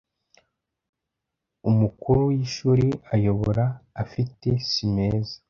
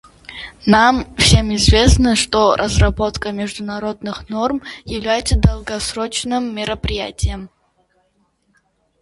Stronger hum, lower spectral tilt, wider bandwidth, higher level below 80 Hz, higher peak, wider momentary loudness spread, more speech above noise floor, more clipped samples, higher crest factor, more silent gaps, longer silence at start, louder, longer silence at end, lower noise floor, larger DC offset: neither; first, -7.5 dB/octave vs -4.5 dB/octave; second, 7.2 kHz vs 11.5 kHz; second, -46 dBFS vs -24 dBFS; second, -8 dBFS vs 0 dBFS; second, 8 LU vs 13 LU; first, 60 dB vs 46 dB; neither; about the same, 18 dB vs 18 dB; neither; first, 1.65 s vs 0.3 s; second, -24 LUFS vs -17 LUFS; second, 0.15 s vs 1.55 s; first, -83 dBFS vs -63 dBFS; neither